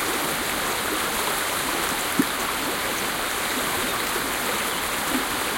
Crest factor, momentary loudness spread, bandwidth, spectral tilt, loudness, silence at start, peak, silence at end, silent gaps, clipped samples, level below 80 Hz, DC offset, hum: 18 dB; 1 LU; 17 kHz; -1.5 dB/octave; -24 LUFS; 0 s; -8 dBFS; 0 s; none; under 0.1%; -48 dBFS; under 0.1%; none